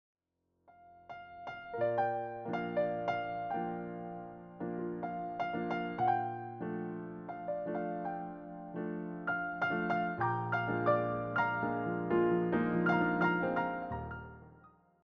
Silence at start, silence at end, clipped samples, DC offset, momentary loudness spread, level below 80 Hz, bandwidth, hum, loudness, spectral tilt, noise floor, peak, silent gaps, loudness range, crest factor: 0.7 s; 0.4 s; under 0.1%; under 0.1%; 14 LU; -64 dBFS; 6.2 kHz; none; -35 LUFS; -6 dB/octave; -81 dBFS; -16 dBFS; none; 6 LU; 20 dB